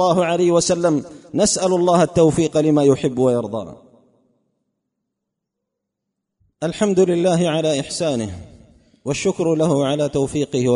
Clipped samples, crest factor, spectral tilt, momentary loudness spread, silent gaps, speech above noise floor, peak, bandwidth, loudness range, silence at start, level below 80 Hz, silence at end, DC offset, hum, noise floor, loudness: under 0.1%; 16 dB; -5.5 dB/octave; 11 LU; none; 62 dB; -2 dBFS; 11 kHz; 10 LU; 0 s; -50 dBFS; 0 s; under 0.1%; none; -80 dBFS; -18 LUFS